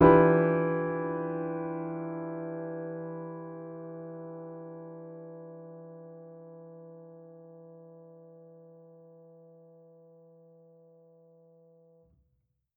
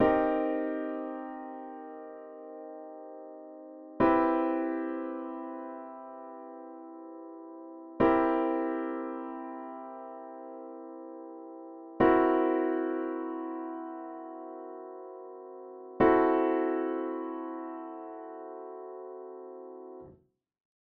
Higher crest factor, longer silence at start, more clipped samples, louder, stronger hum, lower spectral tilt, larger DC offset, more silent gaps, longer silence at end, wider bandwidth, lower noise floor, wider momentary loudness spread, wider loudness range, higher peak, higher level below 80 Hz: about the same, 26 dB vs 22 dB; about the same, 0 s vs 0 s; neither; about the same, -31 LUFS vs -30 LUFS; neither; first, -8.5 dB/octave vs -5.5 dB/octave; neither; neither; first, 4.15 s vs 0.75 s; second, 3.9 kHz vs 4.3 kHz; first, -76 dBFS vs -64 dBFS; first, 25 LU vs 21 LU; first, 23 LU vs 11 LU; about the same, -8 dBFS vs -10 dBFS; about the same, -58 dBFS vs -62 dBFS